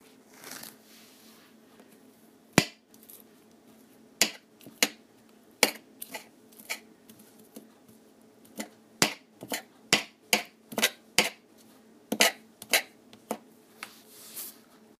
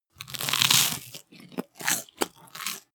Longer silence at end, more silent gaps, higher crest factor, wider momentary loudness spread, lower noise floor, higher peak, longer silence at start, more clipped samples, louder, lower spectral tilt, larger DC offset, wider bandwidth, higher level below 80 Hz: first, 0.5 s vs 0.15 s; neither; first, 34 dB vs 28 dB; about the same, 22 LU vs 20 LU; first, -58 dBFS vs -47 dBFS; about the same, 0 dBFS vs 0 dBFS; first, 0.45 s vs 0.2 s; neither; second, -29 LUFS vs -25 LUFS; about the same, -1.5 dB/octave vs -0.5 dB/octave; neither; second, 15.5 kHz vs over 20 kHz; about the same, -70 dBFS vs -68 dBFS